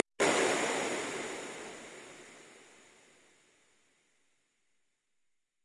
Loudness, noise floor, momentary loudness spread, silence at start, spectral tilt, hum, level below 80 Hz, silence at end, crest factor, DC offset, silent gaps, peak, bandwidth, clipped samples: -32 LUFS; -82 dBFS; 24 LU; 0.2 s; -2 dB/octave; none; -78 dBFS; 3 s; 28 dB; under 0.1%; none; -10 dBFS; 12 kHz; under 0.1%